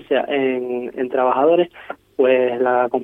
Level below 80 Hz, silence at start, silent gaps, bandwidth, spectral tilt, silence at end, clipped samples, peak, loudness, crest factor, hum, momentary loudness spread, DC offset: -64 dBFS; 0.1 s; none; 3.9 kHz; -7.5 dB/octave; 0 s; under 0.1%; -4 dBFS; -18 LUFS; 14 dB; none; 9 LU; under 0.1%